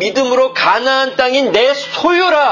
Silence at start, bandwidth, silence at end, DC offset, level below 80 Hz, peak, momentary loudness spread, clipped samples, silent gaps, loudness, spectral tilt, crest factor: 0 s; 7.4 kHz; 0 s; under 0.1%; -56 dBFS; 0 dBFS; 3 LU; under 0.1%; none; -12 LUFS; -2.5 dB/octave; 12 dB